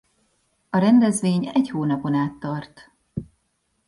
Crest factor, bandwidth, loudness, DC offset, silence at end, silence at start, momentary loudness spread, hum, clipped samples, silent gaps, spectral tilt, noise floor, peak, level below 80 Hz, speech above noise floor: 16 dB; 11.5 kHz; -21 LUFS; under 0.1%; 0.65 s; 0.75 s; 19 LU; none; under 0.1%; none; -6.5 dB/octave; -71 dBFS; -6 dBFS; -58 dBFS; 50 dB